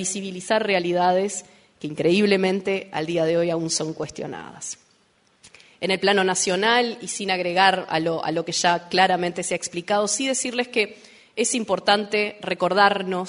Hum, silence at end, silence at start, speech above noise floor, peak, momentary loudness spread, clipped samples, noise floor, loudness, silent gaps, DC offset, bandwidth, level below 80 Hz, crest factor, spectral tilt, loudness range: none; 0 s; 0 s; 40 dB; -2 dBFS; 13 LU; under 0.1%; -62 dBFS; -22 LUFS; none; under 0.1%; 11 kHz; -66 dBFS; 20 dB; -3 dB/octave; 4 LU